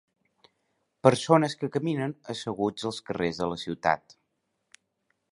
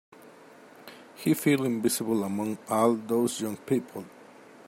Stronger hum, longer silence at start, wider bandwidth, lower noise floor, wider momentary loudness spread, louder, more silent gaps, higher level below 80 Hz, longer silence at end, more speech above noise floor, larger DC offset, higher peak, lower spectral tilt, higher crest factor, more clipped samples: neither; first, 1.05 s vs 0.2 s; second, 11.5 kHz vs 16.5 kHz; first, -78 dBFS vs -52 dBFS; second, 10 LU vs 23 LU; about the same, -27 LUFS vs -27 LUFS; neither; first, -62 dBFS vs -74 dBFS; first, 1.35 s vs 0.45 s; first, 51 dB vs 25 dB; neither; first, -2 dBFS vs -10 dBFS; about the same, -5.5 dB/octave vs -5 dB/octave; first, 26 dB vs 20 dB; neither